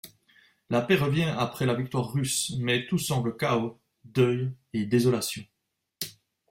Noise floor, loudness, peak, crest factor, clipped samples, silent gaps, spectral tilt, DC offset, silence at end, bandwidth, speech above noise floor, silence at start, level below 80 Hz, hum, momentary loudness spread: -81 dBFS; -27 LUFS; -10 dBFS; 18 dB; under 0.1%; none; -5 dB/octave; under 0.1%; 0.4 s; 16 kHz; 55 dB; 0.05 s; -60 dBFS; none; 12 LU